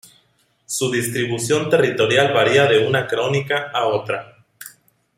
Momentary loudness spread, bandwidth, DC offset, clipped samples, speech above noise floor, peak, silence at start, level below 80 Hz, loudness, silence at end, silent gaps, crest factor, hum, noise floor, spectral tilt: 13 LU; 16 kHz; under 0.1%; under 0.1%; 44 dB; 0 dBFS; 0.7 s; -60 dBFS; -18 LUFS; 0.5 s; none; 20 dB; none; -62 dBFS; -4 dB/octave